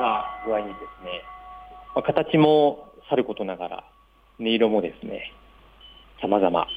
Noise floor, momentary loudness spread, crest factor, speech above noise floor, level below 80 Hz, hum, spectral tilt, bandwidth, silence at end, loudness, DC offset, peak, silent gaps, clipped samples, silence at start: -50 dBFS; 21 LU; 20 dB; 27 dB; -56 dBFS; none; -8 dB/octave; 4.9 kHz; 0 s; -24 LUFS; under 0.1%; -6 dBFS; none; under 0.1%; 0 s